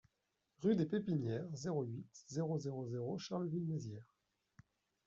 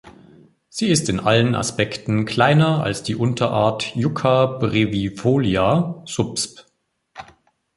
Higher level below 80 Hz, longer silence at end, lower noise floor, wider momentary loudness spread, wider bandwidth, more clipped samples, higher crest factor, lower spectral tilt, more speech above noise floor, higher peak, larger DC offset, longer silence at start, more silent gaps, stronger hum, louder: second, -78 dBFS vs -48 dBFS; first, 1.05 s vs 0.55 s; first, -86 dBFS vs -66 dBFS; first, 10 LU vs 7 LU; second, 7.8 kHz vs 11.5 kHz; neither; about the same, 18 dB vs 18 dB; first, -8 dB/octave vs -5.5 dB/octave; about the same, 46 dB vs 47 dB; second, -24 dBFS vs -2 dBFS; neither; first, 0.6 s vs 0.05 s; neither; neither; second, -41 LUFS vs -19 LUFS